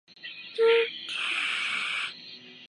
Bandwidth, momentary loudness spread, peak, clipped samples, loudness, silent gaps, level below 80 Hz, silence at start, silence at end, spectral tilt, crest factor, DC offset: 11 kHz; 19 LU; -12 dBFS; under 0.1%; -27 LUFS; none; -86 dBFS; 0.1 s; 0 s; -0.5 dB/octave; 18 dB; under 0.1%